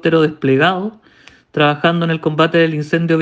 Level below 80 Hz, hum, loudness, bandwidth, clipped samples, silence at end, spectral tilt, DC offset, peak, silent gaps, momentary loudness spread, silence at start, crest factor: -58 dBFS; none; -15 LUFS; 7.8 kHz; under 0.1%; 0 s; -7.5 dB/octave; under 0.1%; 0 dBFS; none; 7 LU; 0.05 s; 16 dB